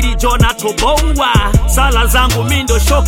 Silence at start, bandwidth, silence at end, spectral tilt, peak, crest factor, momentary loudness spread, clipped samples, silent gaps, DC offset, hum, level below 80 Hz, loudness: 0 s; 17 kHz; 0 s; -4 dB/octave; 0 dBFS; 10 dB; 2 LU; under 0.1%; none; under 0.1%; none; -14 dBFS; -12 LUFS